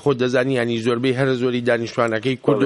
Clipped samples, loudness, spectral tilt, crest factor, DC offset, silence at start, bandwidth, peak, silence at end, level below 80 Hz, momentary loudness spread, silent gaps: under 0.1%; -20 LUFS; -6.5 dB/octave; 16 dB; under 0.1%; 0.05 s; 11.5 kHz; -2 dBFS; 0 s; -60 dBFS; 2 LU; none